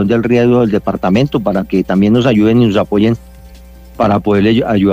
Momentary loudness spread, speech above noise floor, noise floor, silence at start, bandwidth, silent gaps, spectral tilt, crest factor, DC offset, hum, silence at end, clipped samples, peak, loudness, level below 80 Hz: 5 LU; 24 dB; -35 dBFS; 0 s; 15.5 kHz; none; -8 dB/octave; 10 dB; under 0.1%; none; 0 s; under 0.1%; -2 dBFS; -12 LUFS; -36 dBFS